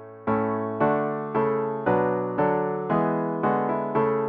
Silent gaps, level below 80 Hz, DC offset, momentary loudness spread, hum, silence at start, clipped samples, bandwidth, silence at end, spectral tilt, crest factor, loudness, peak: none; -60 dBFS; under 0.1%; 3 LU; none; 0 s; under 0.1%; 4.5 kHz; 0 s; -11 dB/octave; 14 dB; -25 LUFS; -10 dBFS